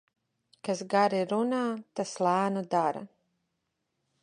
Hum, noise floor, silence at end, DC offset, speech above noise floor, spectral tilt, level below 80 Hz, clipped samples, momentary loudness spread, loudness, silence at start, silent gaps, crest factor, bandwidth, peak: none; -81 dBFS; 1.15 s; under 0.1%; 53 dB; -5.5 dB/octave; -80 dBFS; under 0.1%; 9 LU; -29 LUFS; 0.65 s; none; 20 dB; 10.5 kHz; -12 dBFS